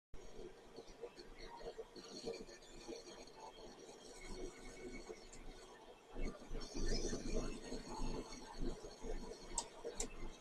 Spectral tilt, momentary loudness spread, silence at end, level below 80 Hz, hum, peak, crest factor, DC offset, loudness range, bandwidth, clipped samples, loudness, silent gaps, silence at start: -3.5 dB/octave; 12 LU; 0 s; -50 dBFS; none; -24 dBFS; 22 dB; under 0.1%; 7 LU; 11.5 kHz; under 0.1%; -50 LUFS; none; 0.15 s